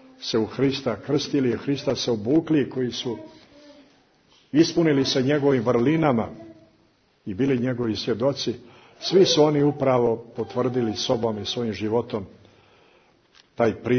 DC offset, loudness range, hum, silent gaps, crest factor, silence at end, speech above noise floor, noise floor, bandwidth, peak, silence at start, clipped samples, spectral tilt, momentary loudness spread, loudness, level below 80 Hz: under 0.1%; 4 LU; none; none; 18 dB; 0 s; 40 dB; -62 dBFS; 6.6 kHz; -6 dBFS; 0.2 s; under 0.1%; -5.5 dB/octave; 11 LU; -23 LUFS; -58 dBFS